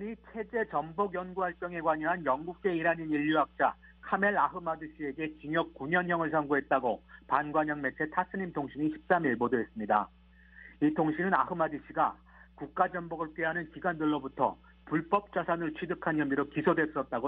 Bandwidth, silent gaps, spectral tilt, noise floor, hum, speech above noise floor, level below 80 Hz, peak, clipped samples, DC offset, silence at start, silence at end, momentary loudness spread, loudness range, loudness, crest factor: 4.1 kHz; none; -9 dB/octave; -55 dBFS; none; 24 dB; -62 dBFS; -10 dBFS; under 0.1%; under 0.1%; 0 s; 0 s; 8 LU; 2 LU; -31 LUFS; 20 dB